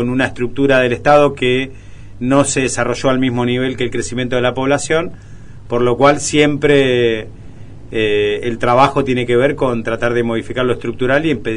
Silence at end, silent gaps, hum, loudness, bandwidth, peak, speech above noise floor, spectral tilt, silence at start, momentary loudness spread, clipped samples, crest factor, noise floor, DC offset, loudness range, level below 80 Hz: 0 s; none; none; -15 LUFS; 11 kHz; 0 dBFS; 20 dB; -5 dB/octave; 0 s; 7 LU; under 0.1%; 16 dB; -35 dBFS; 2%; 2 LU; -38 dBFS